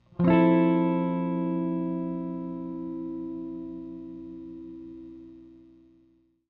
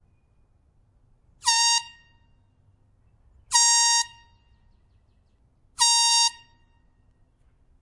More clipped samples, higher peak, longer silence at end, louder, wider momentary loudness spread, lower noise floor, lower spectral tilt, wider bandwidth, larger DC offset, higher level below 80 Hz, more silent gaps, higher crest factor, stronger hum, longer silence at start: neither; second, -10 dBFS vs -2 dBFS; second, 0.9 s vs 1.5 s; second, -27 LUFS vs -19 LUFS; first, 22 LU vs 8 LU; about the same, -64 dBFS vs -62 dBFS; first, -11.5 dB/octave vs 5 dB/octave; second, 4.2 kHz vs 12 kHz; neither; about the same, -58 dBFS vs -62 dBFS; neither; second, 18 dB vs 24 dB; first, 60 Hz at -55 dBFS vs none; second, 0.2 s vs 1.45 s